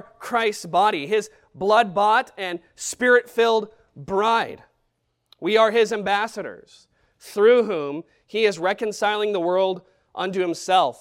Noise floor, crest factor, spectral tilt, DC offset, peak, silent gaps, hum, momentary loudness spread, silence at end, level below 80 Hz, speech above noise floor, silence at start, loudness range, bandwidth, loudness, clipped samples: -72 dBFS; 18 dB; -3.5 dB/octave; under 0.1%; -4 dBFS; none; none; 13 LU; 0.05 s; -64 dBFS; 51 dB; 0.2 s; 2 LU; 15.5 kHz; -21 LUFS; under 0.1%